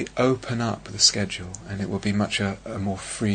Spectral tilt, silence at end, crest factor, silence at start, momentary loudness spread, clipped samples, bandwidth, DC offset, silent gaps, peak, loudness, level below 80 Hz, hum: -3.5 dB/octave; 0 s; 22 dB; 0 s; 12 LU; under 0.1%; 9.6 kHz; under 0.1%; none; -4 dBFS; -24 LUFS; -50 dBFS; none